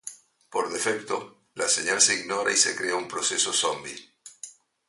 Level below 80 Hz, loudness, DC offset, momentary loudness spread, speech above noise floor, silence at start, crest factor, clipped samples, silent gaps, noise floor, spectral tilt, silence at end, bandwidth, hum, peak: -72 dBFS; -24 LUFS; under 0.1%; 22 LU; 21 dB; 0.05 s; 22 dB; under 0.1%; none; -47 dBFS; 0 dB/octave; 0.35 s; 12 kHz; none; -4 dBFS